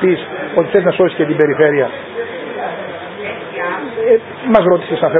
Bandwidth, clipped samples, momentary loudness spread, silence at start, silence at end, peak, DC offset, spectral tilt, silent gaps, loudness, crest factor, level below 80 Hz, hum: 4 kHz; under 0.1%; 13 LU; 0 s; 0 s; 0 dBFS; under 0.1%; -9.5 dB/octave; none; -15 LUFS; 14 dB; -52 dBFS; none